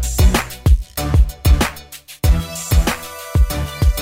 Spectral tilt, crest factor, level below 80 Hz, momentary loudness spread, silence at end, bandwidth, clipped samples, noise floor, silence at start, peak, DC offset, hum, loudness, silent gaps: -5 dB/octave; 12 dB; -18 dBFS; 6 LU; 0 s; 16.5 kHz; under 0.1%; -37 dBFS; 0 s; -2 dBFS; under 0.1%; none; -18 LUFS; none